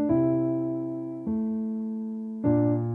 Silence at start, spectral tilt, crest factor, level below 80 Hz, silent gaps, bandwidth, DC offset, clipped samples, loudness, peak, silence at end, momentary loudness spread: 0 s; -13 dB/octave; 14 dB; -58 dBFS; none; 2.5 kHz; under 0.1%; under 0.1%; -28 LUFS; -12 dBFS; 0 s; 10 LU